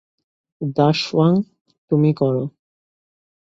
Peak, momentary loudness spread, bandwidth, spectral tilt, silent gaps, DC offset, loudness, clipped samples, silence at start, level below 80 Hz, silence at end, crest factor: -2 dBFS; 12 LU; 7.8 kHz; -7.5 dB/octave; 1.61-1.65 s, 1.78-1.88 s; under 0.1%; -19 LUFS; under 0.1%; 0.6 s; -60 dBFS; 0.95 s; 18 dB